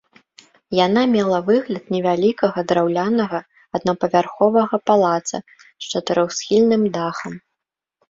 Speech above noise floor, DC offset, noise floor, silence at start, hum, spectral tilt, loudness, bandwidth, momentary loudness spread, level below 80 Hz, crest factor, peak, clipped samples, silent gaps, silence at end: 64 dB; under 0.1%; -82 dBFS; 0.7 s; none; -5 dB/octave; -19 LUFS; 7.8 kHz; 12 LU; -60 dBFS; 18 dB; -2 dBFS; under 0.1%; none; 0.7 s